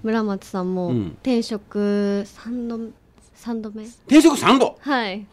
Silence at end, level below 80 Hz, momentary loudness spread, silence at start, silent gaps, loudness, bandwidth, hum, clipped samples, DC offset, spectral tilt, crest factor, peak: 0.05 s; -54 dBFS; 17 LU; 0.05 s; none; -20 LUFS; 15 kHz; none; under 0.1%; under 0.1%; -5 dB/octave; 18 dB; -4 dBFS